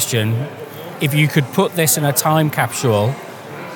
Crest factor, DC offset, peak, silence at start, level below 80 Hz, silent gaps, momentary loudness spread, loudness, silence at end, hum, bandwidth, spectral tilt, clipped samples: 16 dB; under 0.1%; 0 dBFS; 0 s; -66 dBFS; none; 16 LU; -16 LUFS; 0 s; none; 19 kHz; -4.5 dB/octave; under 0.1%